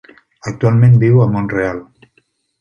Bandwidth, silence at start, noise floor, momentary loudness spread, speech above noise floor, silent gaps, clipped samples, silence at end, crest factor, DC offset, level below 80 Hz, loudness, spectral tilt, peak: 7.2 kHz; 0.45 s; -60 dBFS; 19 LU; 48 dB; none; under 0.1%; 0.8 s; 12 dB; under 0.1%; -44 dBFS; -13 LUFS; -9.5 dB/octave; -2 dBFS